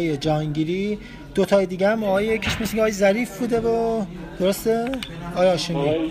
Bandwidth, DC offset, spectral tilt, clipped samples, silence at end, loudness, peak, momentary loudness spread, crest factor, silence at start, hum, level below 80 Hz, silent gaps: 15.5 kHz; under 0.1%; -5.5 dB/octave; under 0.1%; 0 s; -22 LUFS; -6 dBFS; 8 LU; 16 dB; 0 s; none; -44 dBFS; none